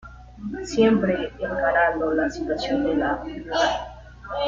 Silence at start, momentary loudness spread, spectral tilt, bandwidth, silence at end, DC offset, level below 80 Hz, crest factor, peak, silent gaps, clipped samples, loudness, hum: 0.05 s; 14 LU; -5 dB/octave; 7.8 kHz; 0 s; under 0.1%; -44 dBFS; 18 dB; -6 dBFS; none; under 0.1%; -23 LUFS; none